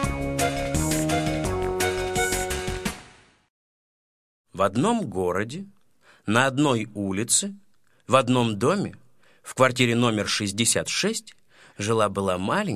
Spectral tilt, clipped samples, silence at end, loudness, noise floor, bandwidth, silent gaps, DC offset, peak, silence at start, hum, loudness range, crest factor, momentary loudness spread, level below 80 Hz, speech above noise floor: -4 dB/octave; under 0.1%; 0 s; -24 LUFS; -59 dBFS; 16 kHz; 3.50-4.44 s; under 0.1%; -2 dBFS; 0 s; none; 6 LU; 22 dB; 12 LU; -42 dBFS; 35 dB